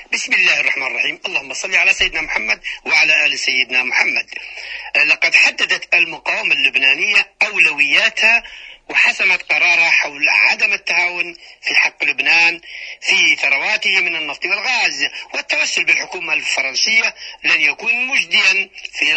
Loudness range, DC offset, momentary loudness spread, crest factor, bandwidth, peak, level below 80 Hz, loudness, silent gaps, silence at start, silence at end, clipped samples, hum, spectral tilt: 3 LU; under 0.1%; 9 LU; 16 dB; 10 kHz; 0 dBFS; -54 dBFS; -13 LUFS; none; 0 s; 0 s; under 0.1%; none; 0.5 dB/octave